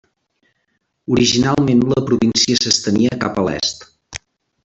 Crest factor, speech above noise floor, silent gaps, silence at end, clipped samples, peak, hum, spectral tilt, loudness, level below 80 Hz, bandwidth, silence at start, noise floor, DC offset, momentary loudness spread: 18 dB; 53 dB; none; 0.45 s; under 0.1%; 0 dBFS; none; -4 dB/octave; -16 LUFS; -48 dBFS; 8.2 kHz; 1.1 s; -69 dBFS; under 0.1%; 20 LU